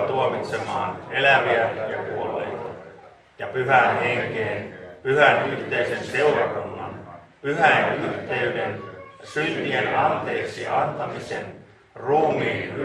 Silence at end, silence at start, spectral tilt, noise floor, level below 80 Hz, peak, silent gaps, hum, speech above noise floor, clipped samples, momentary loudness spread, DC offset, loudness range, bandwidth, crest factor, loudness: 0 s; 0 s; -5.5 dB/octave; -48 dBFS; -60 dBFS; -2 dBFS; none; none; 25 dB; under 0.1%; 16 LU; under 0.1%; 4 LU; 11.5 kHz; 20 dB; -23 LUFS